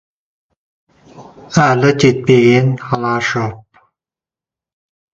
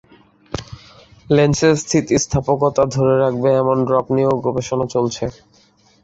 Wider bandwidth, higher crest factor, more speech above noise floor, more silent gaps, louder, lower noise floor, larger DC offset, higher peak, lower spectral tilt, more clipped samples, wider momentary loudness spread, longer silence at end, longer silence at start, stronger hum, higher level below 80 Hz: about the same, 7.8 kHz vs 8.2 kHz; about the same, 16 dB vs 16 dB; first, 78 dB vs 37 dB; neither; first, -13 LUFS vs -17 LUFS; first, -90 dBFS vs -54 dBFS; neither; about the same, 0 dBFS vs -2 dBFS; about the same, -6 dB/octave vs -5.5 dB/octave; neither; second, 9 LU vs 12 LU; first, 1.55 s vs 0.7 s; first, 1.15 s vs 0.5 s; neither; second, -50 dBFS vs -44 dBFS